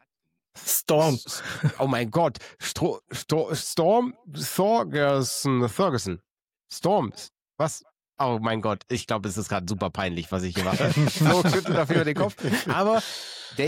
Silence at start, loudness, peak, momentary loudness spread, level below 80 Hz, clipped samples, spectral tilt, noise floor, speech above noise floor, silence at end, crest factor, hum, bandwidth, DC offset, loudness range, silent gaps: 0.55 s; -25 LUFS; -10 dBFS; 11 LU; -58 dBFS; under 0.1%; -5 dB/octave; -81 dBFS; 56 dB; 0 s; 16 dB; none; 17 kHz; under 0.1%; 5 LU; 6.31-6.47 s, 7.42-7.46 s